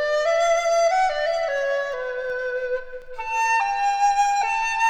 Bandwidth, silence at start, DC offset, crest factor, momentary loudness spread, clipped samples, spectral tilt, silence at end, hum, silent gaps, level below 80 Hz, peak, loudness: 14.5 kHz; 0 s; under 0.1%; 12 dB; 8 LU; under 0.1%; 1 dB/octave; 0 s; none; none; -50 dBFS; -10 dBFS; -22 LUFS